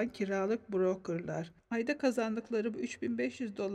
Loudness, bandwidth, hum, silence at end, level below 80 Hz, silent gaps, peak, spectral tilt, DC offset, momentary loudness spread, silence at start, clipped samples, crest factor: -35 LUFS; 12.5 kHz; none; 0 s; -72 dBFS; none; -18 dBFS; -6 dB/octave; under 0.1%; 6 LU; 0 s; under 0.1%; 16 dB